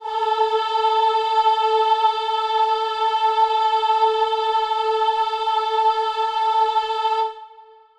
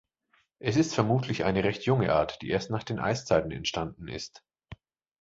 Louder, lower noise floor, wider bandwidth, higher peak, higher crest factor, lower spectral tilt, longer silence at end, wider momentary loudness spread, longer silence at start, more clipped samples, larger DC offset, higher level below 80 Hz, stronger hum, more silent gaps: first, -19 LUFS vs -28 LUFS; second, -47 dBFS vs -70 dBFS; first, 9 kHz vs 7.8 kHz; about the same, -8 dBFS vs -8 dBFS; second, 12 dB vs 22 dB; second, 0 dB/octave vs -5.5 dB/octave; about the same, 0.4 s vs 0.45 s; second, 4 LU vs 11 LU; second, 0 s vs 0.6 s; neither; neither; second, -64 dBFS vs -52 dBFS; neither; neither